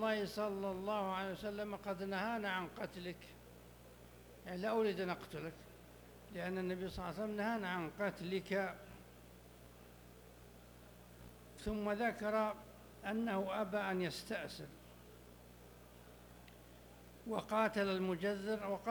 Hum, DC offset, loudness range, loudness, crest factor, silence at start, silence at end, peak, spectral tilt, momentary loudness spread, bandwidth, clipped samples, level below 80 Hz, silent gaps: 60 Hz at -65 dBFS; under 0.1%; 7 LU; -41 LUFS; 20 dB; 0 s; 0 s; -22 dBFS; -5.5 dB/octave; 22 LU; over 20 kHz; under 0.1%; -64 dBFS; none